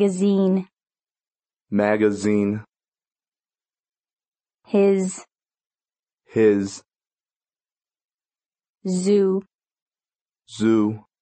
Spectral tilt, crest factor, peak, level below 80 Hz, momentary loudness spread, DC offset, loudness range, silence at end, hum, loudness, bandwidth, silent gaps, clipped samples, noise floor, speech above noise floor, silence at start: -6.5 dB/octave; 18 dB; -6 dBFS; -68 dBFS; 13 LU; under 0.1%; 3 LU; 0.25 s; none; -21 LUFS; 8.8 kHz; 2.88-2.92 s, 4.28-4.32 s, 5.99-6.03 s, 7.36-7.40 s, 8.69-8.74 s, 9.55-9.59 s, 9.82-9.86 s, 10.21-10.25 s; under 0.1%; under -90 dBFS; over 71 dB; 0 s